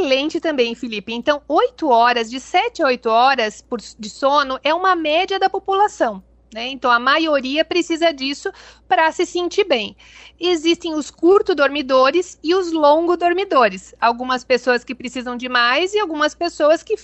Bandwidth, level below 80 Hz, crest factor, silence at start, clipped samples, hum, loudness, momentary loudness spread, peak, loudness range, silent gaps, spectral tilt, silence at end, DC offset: 8.4 kHz; -54 dBFS; 14 dB; 0 s; under 0.1%; none; -17 LUFS; 11 LU; -4 dBFS; 3 LU; none; -3 dB/octave; 0.1 s; under 0.1%